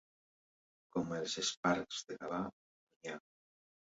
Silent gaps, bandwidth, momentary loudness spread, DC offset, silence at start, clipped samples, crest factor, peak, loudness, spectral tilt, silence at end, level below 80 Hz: 1.57-1.63 s, 2.53-2.87 s, 2.96-3.01 s; 7.6 kHz; 13 LU; under 0.1%; 0.95 s; under 0.1%; 22 dB; -20 dBFS; -39 LUFS; -3 dB/octave; 0.7 s; -74 dBFS